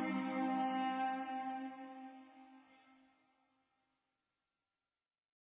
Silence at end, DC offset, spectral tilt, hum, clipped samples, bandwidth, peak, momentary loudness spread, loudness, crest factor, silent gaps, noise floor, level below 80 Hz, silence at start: 2.8 s; under 0.1%; -3.5 dB/octave; none; under 0.1%; 4 kHz; -28 dBFS; 20 LU; -40 LUFS; 16 dB; none; under -90 dBFS; under -90 dBFS; 0 s